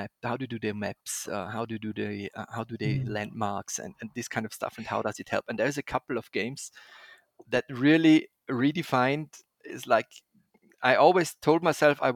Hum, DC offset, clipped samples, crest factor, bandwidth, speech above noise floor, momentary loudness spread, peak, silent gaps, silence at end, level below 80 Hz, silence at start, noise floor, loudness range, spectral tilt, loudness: none; under 0.1%; under 0.1%; 22 dB; 16 kHz; 36 dB; 15 LU; -6 dBFS; none; 0 s; -64 dBFS; 0 s; -64 dBFS; 7 LU; -5 dB/octave; -28 LUFS